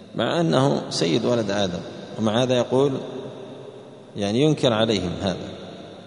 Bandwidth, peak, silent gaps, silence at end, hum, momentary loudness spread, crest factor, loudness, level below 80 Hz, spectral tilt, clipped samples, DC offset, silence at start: 10.5 kHz; -4 dBFS; none; 0 s; none; 19 LU; 20 dB; -22 LUFS; -56 dBFS; -5.5 dB/octave; under 0.1%; under 0.1%; 0 s